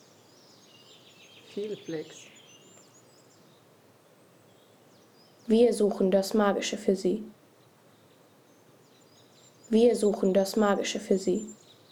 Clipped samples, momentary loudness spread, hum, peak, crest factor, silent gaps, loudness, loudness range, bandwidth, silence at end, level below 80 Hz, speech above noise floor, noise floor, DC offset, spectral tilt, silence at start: under 0.1%; 20 LU; none; -10 dBFS; 18 dB; none; -27 LUFS; 15 LU; 19 kHz; 0.35 s; -66 dBFS; 33 dB; -59 dBFS; under 0.1%; -5.5 dB/octave; 1.55 s